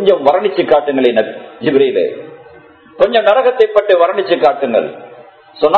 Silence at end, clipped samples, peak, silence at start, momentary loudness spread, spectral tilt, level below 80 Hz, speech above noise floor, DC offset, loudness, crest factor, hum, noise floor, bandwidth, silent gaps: 0 s; 0.2%; 0 dBFS; 0 s; 10 LU; -7 dB/octave; -56 dBFS; 28 dB; under 0.1%; -13 LUFS; 12 dB; none; -40 dBFS; 5.8 kHz; none